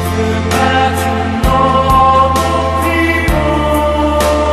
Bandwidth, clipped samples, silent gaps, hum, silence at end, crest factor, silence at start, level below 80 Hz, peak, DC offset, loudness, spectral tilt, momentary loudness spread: 13.5 kHz; under 0.1%; none; none; 0 s; 12 dB; 0 s; -22 dBFS; 0 dBFS; under 0.1%; -12 LUFS; -5.5 dB/octave; 5 LU